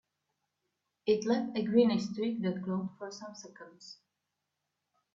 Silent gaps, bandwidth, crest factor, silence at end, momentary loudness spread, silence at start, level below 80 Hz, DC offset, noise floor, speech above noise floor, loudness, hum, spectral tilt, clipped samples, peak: none; 7.6 kHz; 22 dB; 1.2 s; 23 LU; 1.05 s; -76 dBFS; under 0.1%; -86 dBFS; 54 dB; -31 LUFS; none; -6.5 dB/octave; under 0.1%; -14 dBFS